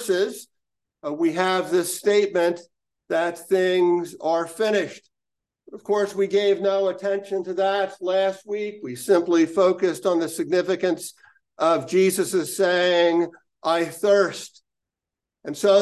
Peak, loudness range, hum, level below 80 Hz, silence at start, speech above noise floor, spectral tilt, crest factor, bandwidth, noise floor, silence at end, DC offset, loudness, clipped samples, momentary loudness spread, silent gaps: -6 dBFS; 3 LU; none; -76 dBFS; 0 s; 66 dB; -4 dB/octave; 16 dB; 12.5 kHz; -87 dBFS; 0 s; under 0.1%; -22 LUFS; under 0.1%; 11 LU; none